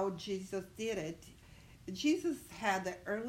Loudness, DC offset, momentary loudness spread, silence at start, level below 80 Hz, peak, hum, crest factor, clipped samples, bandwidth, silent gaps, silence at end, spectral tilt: -38 LUFS; under 0.1%; 19 LU; 0 s; -64 dBFS; -20 dBFS; none; 18 dB; under 0.1%; 16 kHz; none; 0 s; -4.5 dB/octave